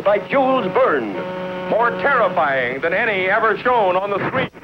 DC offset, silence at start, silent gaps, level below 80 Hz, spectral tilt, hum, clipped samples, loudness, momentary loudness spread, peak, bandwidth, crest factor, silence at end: under 0.1%; 0 s; none; -54 dBFS; -7 dB/octave; none; under 0.1%; -18 LUFS; 5 LU; -4 dBFS; 6.4 kHz; 14 dB; 0.05 s